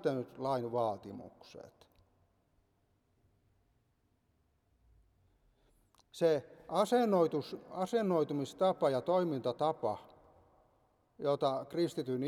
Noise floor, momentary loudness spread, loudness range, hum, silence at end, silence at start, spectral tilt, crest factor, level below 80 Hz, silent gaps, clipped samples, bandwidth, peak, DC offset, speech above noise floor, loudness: -76 dBFS; 16 LU; 9 LU; none; 0 s; 0 s; -6.5 dB/octave; 18 dB; -76 dBFS; none; under 0.1%; 14.5 kHz; -18 dBFS; under 0.1%; 42 dB; -34 LUFS